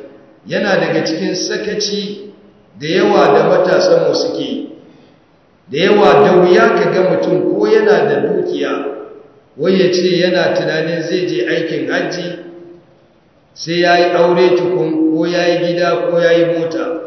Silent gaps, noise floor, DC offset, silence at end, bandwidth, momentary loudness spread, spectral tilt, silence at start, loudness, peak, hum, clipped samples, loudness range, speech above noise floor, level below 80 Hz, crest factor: none; -50 dBFS; under 0.1%; 0 s; 6.4 kHz; 12 LU; -5.5 dB/octave; 0 s; -13 LUFS; 0 dBFS; none; under 0.1%; 5 LU; 38 dB; -60 dBFS; 14 dB